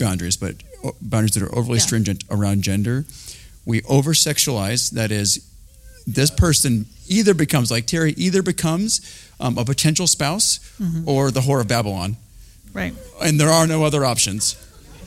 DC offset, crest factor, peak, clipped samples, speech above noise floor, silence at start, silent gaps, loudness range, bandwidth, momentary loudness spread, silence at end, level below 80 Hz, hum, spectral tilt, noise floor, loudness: under 0.1%; 18 dB; -2 dBFS; under 0.1%; 25 dB; 0 s; none; 2 LU; 16.5 kHz; 13 LU; 0 s; -40 dBFS; none; -4 dB/octave; -44 dBFS; -19 LUFS